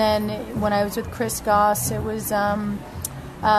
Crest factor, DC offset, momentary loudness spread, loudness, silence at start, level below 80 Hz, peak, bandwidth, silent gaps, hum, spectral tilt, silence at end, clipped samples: 16 dB; under 0.1%; 11 LU; -23 LUFS; 0 s; -42 dBFS; -6 dBFS; 13.5 kHz; none; none; -4.5 dB/octave; 0 s; under 0.1%